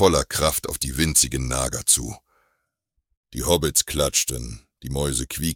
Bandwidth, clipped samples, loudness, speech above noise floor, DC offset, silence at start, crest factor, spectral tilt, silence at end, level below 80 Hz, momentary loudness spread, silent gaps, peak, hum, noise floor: 19 kHz; under 0.1%; -21 LUFS; 53 dB; under 0.1%; 0 s; 22 dB; -3 dB/octave; 0 s; -36 dBFS; 14 LU; 3.17-3.23 s; -2 dBFS; none; -76 dBFS